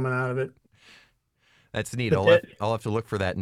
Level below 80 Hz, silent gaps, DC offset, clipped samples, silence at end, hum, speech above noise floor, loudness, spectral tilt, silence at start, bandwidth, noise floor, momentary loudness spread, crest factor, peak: -58 dBFS; none; under 0.1%; under 0.1%; 0 s; none; 41 dB; -25 LUFS; -6 dB/octave; 0 s; 14 kHz; -66 dBFS; 13 LU; 20 dB; -6 dBFS